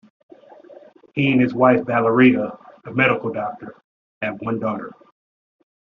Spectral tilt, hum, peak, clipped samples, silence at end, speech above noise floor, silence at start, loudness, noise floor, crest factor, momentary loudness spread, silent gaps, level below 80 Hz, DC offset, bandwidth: -5 dB/octave; none; -2 dBFS; under 0.1%; 1 s; 27 dB; 0.7 s; -19 LUFS; -46 dBFS; 20 dB; 17 LU; 3.84-4.21 s; -60 dBFS; under 0.1%; 4.7 kHz